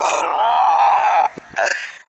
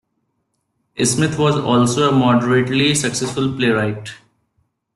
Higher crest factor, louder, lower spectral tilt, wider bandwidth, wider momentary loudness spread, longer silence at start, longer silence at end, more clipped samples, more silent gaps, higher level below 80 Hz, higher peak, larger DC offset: about the same, 12 dB vs 16 dB; about the same, -16 LUFS vs -16 LUFS; second, -0.5 dB/octave vs -4.5 dB/octave; second, 8.4 kHz vs 12.5 kHz; about the same, 8 LU vs 8 LU; second, 0 s vs 0.95 s; second, 0.15 s vs 0.8 s; neither; neither; second, -64 dBFS vs -52 dBFS; about the same, -4 dBFS vs -2 dBFS; neither